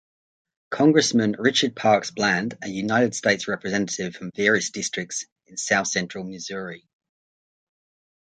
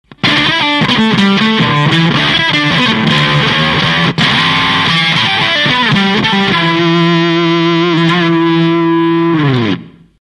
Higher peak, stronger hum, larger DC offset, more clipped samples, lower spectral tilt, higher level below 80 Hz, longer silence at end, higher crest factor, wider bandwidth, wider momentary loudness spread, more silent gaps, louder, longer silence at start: about the same, -2 dBFS vs 0 dBFS; neither; neither; neither; second, -3.5 dB/octave vs -5.5 dB/octave; second, -64 dBFS vs -40 dBFS; first, 1.45 s vs 0.3 s; first, 22 dB vs 10 dB; second, 9.6 kHz vs 11.5 kHz; first, 13 LU vs 2 LU; first, 5.32-5.36 s vs none; second, -23 LUFS vs -10 LUFS; first, 0.7 s vs 0.25 s